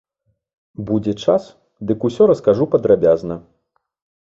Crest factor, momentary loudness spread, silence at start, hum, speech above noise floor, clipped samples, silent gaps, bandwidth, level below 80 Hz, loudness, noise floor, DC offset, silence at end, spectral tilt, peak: 16 dB; 15 LU; 0.8 s; none; 53 dB; under 0.1%; none; 7.8 kHz; -52 dBFS; -17 LUFS; -69 dBFS; under 0.1%; 0.85 s; -8 dB/octave; -2 dBFS